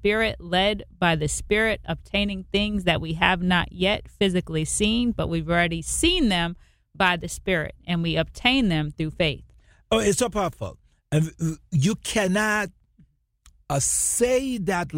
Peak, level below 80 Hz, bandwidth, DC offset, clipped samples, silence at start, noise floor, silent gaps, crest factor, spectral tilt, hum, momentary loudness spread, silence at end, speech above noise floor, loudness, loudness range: -2 dBFS; -40 dBFS; 16.5 kHz; under 0.1%; under 0.1%; 0 s; -59 dBFS; none; 22 dB; -4 dB/octave; none; 7 LU; 0 s; 36 dB; -23 LUFS; 3 LU